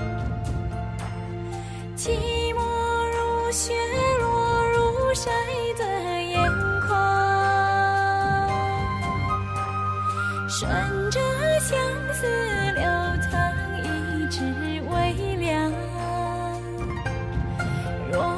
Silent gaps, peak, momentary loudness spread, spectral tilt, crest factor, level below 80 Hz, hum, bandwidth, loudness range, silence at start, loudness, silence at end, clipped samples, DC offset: none; -10 dBFS; 9 LU; -5 dB/octave; 14 dB; -36 dBFS; none; 13.5 kHz; 5 LU; 0 s; -25 LUFS; 0 s; under 0.1%; under 0.1%